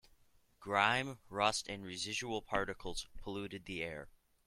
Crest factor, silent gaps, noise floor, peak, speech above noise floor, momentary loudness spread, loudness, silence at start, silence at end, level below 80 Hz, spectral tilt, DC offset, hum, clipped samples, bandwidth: 26 dB; none; -68 dBFS; -14 dBFS; 30 dB; 12 LU; -38 LUFS; 0.6 s; 0.4 s; -58 dBFS; -3 dB/octave; under 0.1%; none; under 0.1%; 15.5 kHz